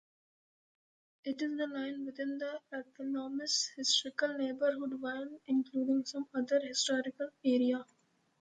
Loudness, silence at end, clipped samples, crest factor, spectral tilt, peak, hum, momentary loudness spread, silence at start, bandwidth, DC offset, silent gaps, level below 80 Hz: -35 LUFS; 0.55 s; under 0.1%; 20 dB; -1.5 dB/octave; -16 dBFS; none; 10 LU; 1.25 s; 9.6 kHz; under 0.1%; none; -84 dBFS